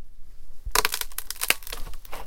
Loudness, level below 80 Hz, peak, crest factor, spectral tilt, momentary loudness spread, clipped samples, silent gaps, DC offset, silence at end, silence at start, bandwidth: -26 LUFS; -38 dBFS; 0 dBFS; 28 dB; 0 dB/octave; 16 LU; under 0.1%; none; under 0.1%; 0 s; 0 s; 17 kHz